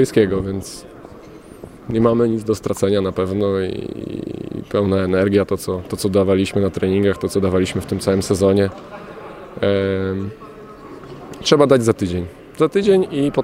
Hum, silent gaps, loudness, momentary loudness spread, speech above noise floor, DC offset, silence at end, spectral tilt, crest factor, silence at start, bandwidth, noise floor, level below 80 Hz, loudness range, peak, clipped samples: none; none; -18 LUFS; 20 LU; 22 dB; under 0.1%; 0 s; -6 dB/octave; 18 dB; 0 s; 16 kHz; -39 dBFS; -48 dBFS; 3 LU; 0 dBFS; under 0.1%